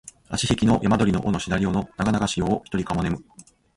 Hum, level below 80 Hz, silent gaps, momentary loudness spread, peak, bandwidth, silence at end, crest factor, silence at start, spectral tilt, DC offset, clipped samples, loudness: none; -42 dBFS; none; 7 LU; -6 dBFS; 11.5 kHz; 0.35 s; 18 dB; 0.05 s; -5.5 dB/octave; under 0.1%; under 0.1%; -23 LUFS